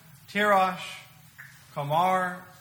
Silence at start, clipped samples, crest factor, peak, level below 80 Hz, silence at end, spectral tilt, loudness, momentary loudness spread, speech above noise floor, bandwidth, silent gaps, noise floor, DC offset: 0.3 s; under 0.1%; 18 dB; -10 dBFS; -70 dBFS; 0.15 s; -5 dB/octave; -26 LUFS; 17 LU; 24 dB; over 20 kHz; none; -50 dBFS; under 0.1%